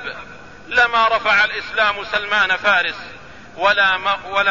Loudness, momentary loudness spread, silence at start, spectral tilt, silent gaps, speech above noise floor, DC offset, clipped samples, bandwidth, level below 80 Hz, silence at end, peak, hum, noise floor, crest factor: -16 LUFS; 11 LU; 0 s; -2 dB/octave; none; 21 dB; 0.6%; under 0.1%; 7.4 kHz; -50 dBFS; 0 s; -4 dBFS; none; -38 dBFS; 14 dB